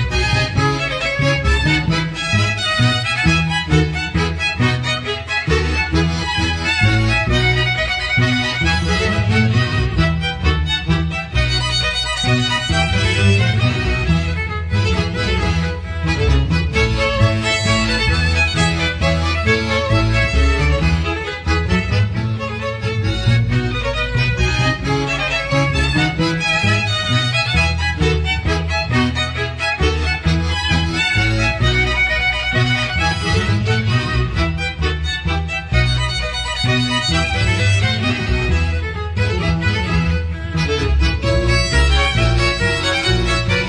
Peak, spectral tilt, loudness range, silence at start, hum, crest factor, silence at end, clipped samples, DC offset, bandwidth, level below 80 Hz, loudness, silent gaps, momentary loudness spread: -2 dBFS; -5 dB/octave; 2 LU; 0 s; none; 14 dB; 0 s; under 0.1%; under 0.1%; 10.5 kHz; -24 dBFS; -17 LUFS; none; 5 LU